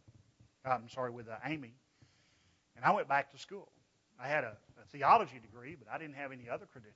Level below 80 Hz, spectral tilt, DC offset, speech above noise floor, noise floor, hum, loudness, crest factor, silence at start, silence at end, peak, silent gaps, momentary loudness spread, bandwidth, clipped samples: -78 dBFS; -3.5 dB/octave; under 0.1%; 35 dB; -72 dBFS; none; -35 LUFS; 24 dB; 0.65 s; 0.15 s; -14 dBFS; none; 22 LU; 7.6 kHz; under 0.1%